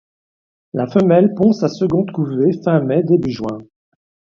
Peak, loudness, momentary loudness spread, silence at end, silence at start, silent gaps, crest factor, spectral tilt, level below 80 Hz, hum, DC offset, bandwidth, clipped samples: 0 dBFS; -16 LUFS; 12 LU; 0.7 s; 0.75 s; none; 16 dB; -9 dB/octave; -54 dBFS; none; under 0.1%; 7.2 kHz; under 0.1%